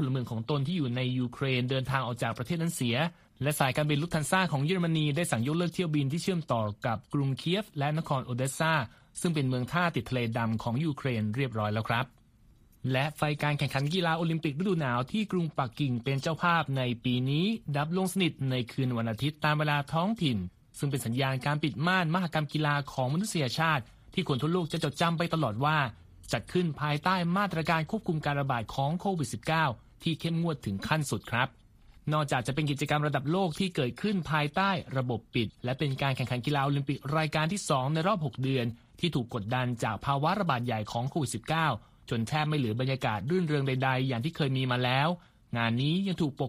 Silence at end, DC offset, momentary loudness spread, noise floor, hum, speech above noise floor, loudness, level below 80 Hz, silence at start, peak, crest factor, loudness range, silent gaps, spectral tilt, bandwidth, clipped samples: 0 s; under 0.1%; 5 LU; -60 dBFS; none; 31 dB; -30 LUFS; -58 dBFS; 0 s; -10 dBFS; 20 dB; 2 LU; none; -5.5 dB/octave; 15.5 kHz; under 0.1%